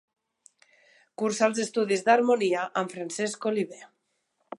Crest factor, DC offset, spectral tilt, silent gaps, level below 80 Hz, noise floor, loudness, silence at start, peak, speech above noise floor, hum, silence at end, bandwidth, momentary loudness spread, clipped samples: 22 dB; under 0.1%; -4 dB/octave; none; -82 dBFS; -75 dBFS; -26 LUFS; 1.2 s; -6 dBFS; 50 dB; none; 0.75 s; 11.5 kHz; 10 LU; under 0.1%